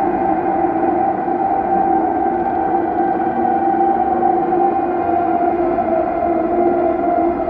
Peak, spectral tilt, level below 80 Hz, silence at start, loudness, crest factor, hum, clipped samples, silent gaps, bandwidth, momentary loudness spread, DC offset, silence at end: -4 dBFS; -10.5 dB/octave; -44 dBFS; 0 s; -17 LUFS; 12 dB; none; under 0.1%; none; 4.2 kHz; 2 LU; under 0.1%; 0 s